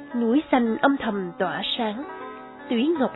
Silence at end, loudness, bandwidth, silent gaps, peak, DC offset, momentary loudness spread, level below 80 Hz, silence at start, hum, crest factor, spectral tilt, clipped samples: 0 s; -24 LUFS; 4.1 kHz; none; -6 dBFS; under 0.1%; 15 LU; -60 dBFS; 0 s; none; 18 dB; -8.5 dB/octave; under 0.1%